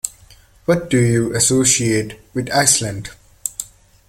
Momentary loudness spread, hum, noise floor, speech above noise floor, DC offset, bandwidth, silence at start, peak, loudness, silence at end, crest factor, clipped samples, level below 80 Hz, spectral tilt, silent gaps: 16 LU; none; -47 dBFS; 31 dB; under 0.1%; 17 kHz; 0.05 s; 0 dBFS; -17 LUFS; 0.45 s; 18 dB; under 0.1%; -46 dBFS; -3.5 dB/octave; none